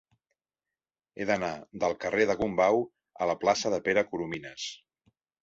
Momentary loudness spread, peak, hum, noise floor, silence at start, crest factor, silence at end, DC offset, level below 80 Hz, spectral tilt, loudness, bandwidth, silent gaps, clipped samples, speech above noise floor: 11 LU; -10 dBFS; none; under -90 dBFS; 1.15 s; 20 dB; 0.65 s; under 0.1%; -62 dBFS; -4 dB/octave; -29 LUFS; 8 kHz; none; under 0.1%; over 62 dB